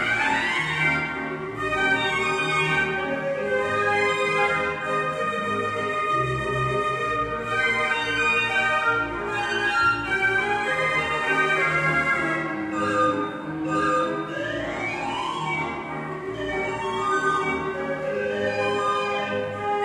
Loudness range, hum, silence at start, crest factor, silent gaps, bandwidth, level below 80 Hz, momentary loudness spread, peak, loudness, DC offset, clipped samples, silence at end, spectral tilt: 4 LU; none; 0 s; 16 dB; none; 13 kHz; -52 dBFS; 7 LU; -8 dBFS; -23 LUFS; under 0.1%; under 0.1%; 0 s; -4.5 dB/octave